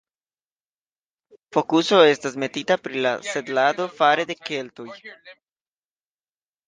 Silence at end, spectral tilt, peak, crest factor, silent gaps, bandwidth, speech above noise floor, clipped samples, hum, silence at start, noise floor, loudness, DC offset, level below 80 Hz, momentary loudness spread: 1.35 s; -4 dB/octave; -4 dBFS; 20 dB; none; 9.8 kHz; over 69 dB; under 0.1%; none; 1.55 s; under -90 dBFS; -21 LUFS; under 0.1%; -74 dBFS; 21 LU